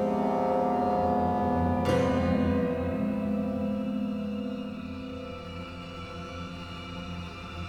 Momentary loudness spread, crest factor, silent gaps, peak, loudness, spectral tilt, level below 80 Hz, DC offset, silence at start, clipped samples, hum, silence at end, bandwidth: 13 LU; 16 dB; none; -14 dBFS; -30 LUFS; -7.5 dB/octave; -48 dBFS; under 0.1%; 0 s; under 0.1%; none; 0 s; 13 kHz